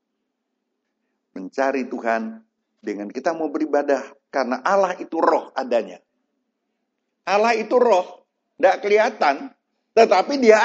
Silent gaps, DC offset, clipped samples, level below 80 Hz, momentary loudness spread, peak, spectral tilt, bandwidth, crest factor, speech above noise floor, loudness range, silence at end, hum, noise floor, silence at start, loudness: none; under 0.1%; under 0.1%; -82 dBFS; 16 LU; 0 dBFS; -4 dB/octave; 7.8 kHz; 22 dB; 57 dB; 7 LU; 0 s; none; -77 dBFS; 1.35 s; -20 LUFS